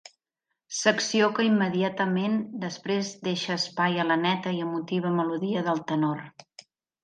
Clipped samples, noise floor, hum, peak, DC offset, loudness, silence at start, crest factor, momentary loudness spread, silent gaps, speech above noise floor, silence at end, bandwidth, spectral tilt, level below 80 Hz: under 0.1%; -83 dBFS; none; -6 dBFS; under 0.1%; -26 LUFS; 0.7 s; 22 dB; 7 LU; none; 57 dB; 0.75 s; 9.6 kHz; -4.5 dB/octave; -76 dBFS